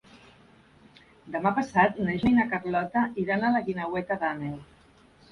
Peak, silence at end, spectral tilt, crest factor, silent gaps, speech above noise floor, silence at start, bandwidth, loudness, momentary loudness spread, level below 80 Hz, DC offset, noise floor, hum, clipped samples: -8 dBFS; 0.65 s; -7.5 dB/octave; 20 dB; none; 31 dB; 0.15 s; 10 kHz; -27 LUFS; 10 LU; -56 dBFS; under 0.1%; -57 dBFS; none; under 0.1%